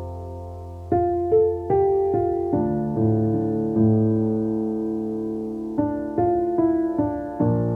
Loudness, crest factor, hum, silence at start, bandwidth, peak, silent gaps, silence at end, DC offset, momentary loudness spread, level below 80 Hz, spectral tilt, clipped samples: -22 LUFS; 14 dB; none; 0 s; 2.5 kHz; -8 dBFS; none; 0 s; under 0.1%; 9 LU; -46 dBFS; -12 dB/octave; under 0.1%